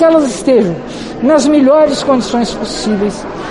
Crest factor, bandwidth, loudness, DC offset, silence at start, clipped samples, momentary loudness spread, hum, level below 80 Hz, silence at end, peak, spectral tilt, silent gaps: 10 dB; 11.5 kHz; -12 LUFS; under 0.1%; 0 s; under 0.1%; 10 LU; none; -40 dBFS; 0 s; 0 dBFS; -5 dB/octave; none